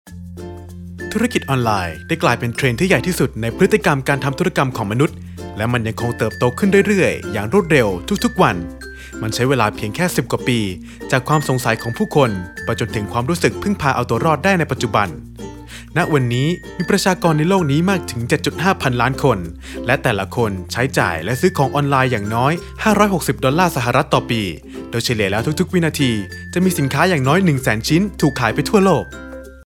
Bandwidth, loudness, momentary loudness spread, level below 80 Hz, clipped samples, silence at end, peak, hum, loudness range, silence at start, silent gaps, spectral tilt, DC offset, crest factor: 18 kHz; -17 LUFS; 11 LU; -40 dBFS; under 0.1%; 0.05 s; 0 dBFS; none; 2 LU; 0.05 s; none; -5.5 dB/octave; under 0.1%; 16 dB